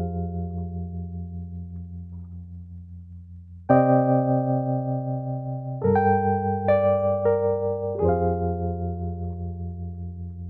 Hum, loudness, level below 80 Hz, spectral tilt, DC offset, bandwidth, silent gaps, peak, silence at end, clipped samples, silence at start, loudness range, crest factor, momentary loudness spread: none; -24 LUFS; -50 dBFS; -13 dB/octave; under 0.1%; 4.1 kHz; none; -6 dBFS; 0 s; under 0.1%; 0 s; 10 LU; 20 dB; 20 LU